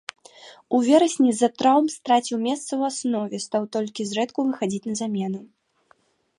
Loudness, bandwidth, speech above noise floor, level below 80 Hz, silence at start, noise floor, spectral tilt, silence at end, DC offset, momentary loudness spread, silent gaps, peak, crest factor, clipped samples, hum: -23 LUFS; 11.5 kHz; 40 dB; -74 dBFS; 0.4 s; -62 dBFS; -4.5 dB/octave; 0.95 s; under 0.1%; 9 LU; none; -6 dBFS; 18 dB; under 0.1%; none